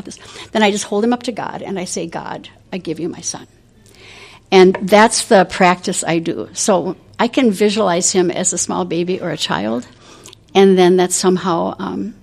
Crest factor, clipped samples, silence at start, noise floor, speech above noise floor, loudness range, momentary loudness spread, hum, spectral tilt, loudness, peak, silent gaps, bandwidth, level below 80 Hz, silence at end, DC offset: 16 dB; under 0.1%; 0.05 s; -44 dBFS; 29 dB; 7 LU; 15 LU; none; -4 dB/octave; -15 LUFS; 0 dBFS; none; 14.5 kHz; -54 dBFS; 0.1 s; under 0.1%